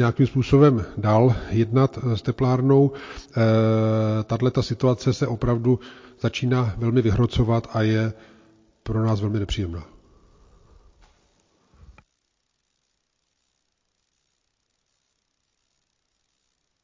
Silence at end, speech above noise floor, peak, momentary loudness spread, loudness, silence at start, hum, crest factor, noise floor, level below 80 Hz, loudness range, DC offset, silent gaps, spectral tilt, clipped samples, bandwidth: 7 s; 54 dB; -4 dBFS; 9 LU; -22 LUFS; 0 s; none; 18 dB; -74 dBFS; -42 dBFS; 10 LU; under 0.1%; none; -8 dB/octave; under 0.1%; 7.6 kHz